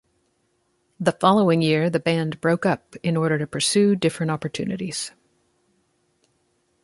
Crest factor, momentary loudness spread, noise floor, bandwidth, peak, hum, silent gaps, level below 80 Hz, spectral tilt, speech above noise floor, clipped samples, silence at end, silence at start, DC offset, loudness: 22 dB; 10 LU; -69 dBFS; 11.5 kHz; -2 dBFS; none; none; -62 dBFS; -5 dB/octave; 47 dB; under 0.1%; 1.75 s; 1 s; under 0.1%; -22 LUFS